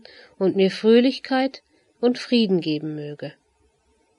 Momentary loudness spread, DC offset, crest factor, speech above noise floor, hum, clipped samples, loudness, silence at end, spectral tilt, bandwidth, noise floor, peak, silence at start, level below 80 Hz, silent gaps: 16 LU; under 0.1%; 18 dB; 44 dB; none; under 0.1%; -21 LUFS; 0.9 s; -6.5 dB/octave; 11 kHz; -64 dBFS; -6 dBFS; 0.4 s; -72 dBFS; none